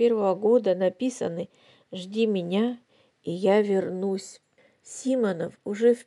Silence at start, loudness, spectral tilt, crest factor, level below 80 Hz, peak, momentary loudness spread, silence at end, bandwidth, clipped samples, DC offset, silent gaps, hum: 0 s; -26 LUFS; -6 dB/octave; 16 dB; -80 dBFS; -10 dBFS; 17 LU; 0.05 s; 11.5 kHz; under 0.1%; under 0.1%; none; none